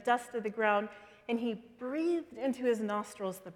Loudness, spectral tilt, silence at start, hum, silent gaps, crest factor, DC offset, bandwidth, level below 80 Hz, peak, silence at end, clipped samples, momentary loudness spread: -34 LUFS; -5 dB/octave; 0 s; none; none; 20 dB; under 0.1%; 16 kHz; -78 dBFS; -14 dBFS; 0.05 s; under 0.1%; 10 LU